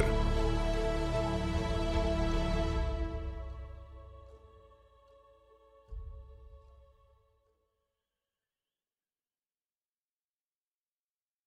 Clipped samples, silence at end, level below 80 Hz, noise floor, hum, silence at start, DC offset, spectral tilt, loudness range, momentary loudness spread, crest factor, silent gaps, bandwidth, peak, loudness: under 0.1%; 4.9 s; -38 dBFS; under -90 dBFS; none; 0 s; under 0.1%; -6.5 dB/octave; 23 LU; 21 LU; 24 dB; none; 11 kHz; -14 dBFS; -34 LUFS